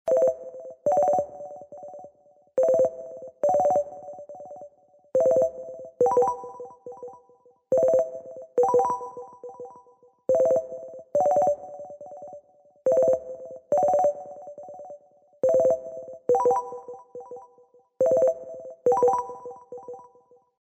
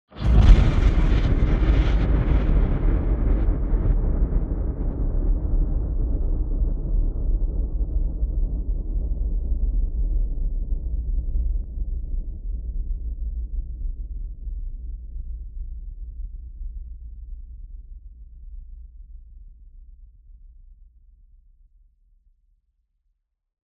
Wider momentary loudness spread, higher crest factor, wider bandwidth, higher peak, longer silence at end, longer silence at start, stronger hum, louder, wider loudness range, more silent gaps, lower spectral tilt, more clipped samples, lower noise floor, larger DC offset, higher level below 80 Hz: about the same, 21 LU vs 20 LU; second, 16 dB vs 22 dB; first, 8.4 kHz vs 4.6 kHz; second, -10 dBFS vs -2 dBFS; second, 0.7 s vs 2.9 s; about the same, 0.05 s vs 0.15 s; neither; about the same, -24 LUFS vs -26 LUFS; second, 2 LU vs 20 LU; neither; second, -7 dB/octave vs -8.5 dB/octave; neither; second, -59 dBFS vs -73 dBFS; neither; second, -68 dBFS vs -24 dBFS